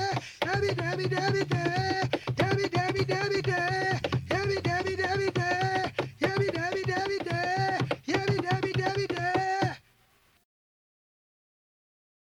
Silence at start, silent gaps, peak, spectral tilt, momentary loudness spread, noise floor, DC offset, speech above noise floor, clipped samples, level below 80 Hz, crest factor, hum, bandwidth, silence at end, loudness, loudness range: 0 s; none; -16 dBFS; -5.5 dB/octave; 3 LU; -65 dBFS; under 0.1%; 37 dB; under 0.1%; -56 dBFS; 14 dB; none; 13.5 kHz; 2.55 s; -29 LUFS; 4 LU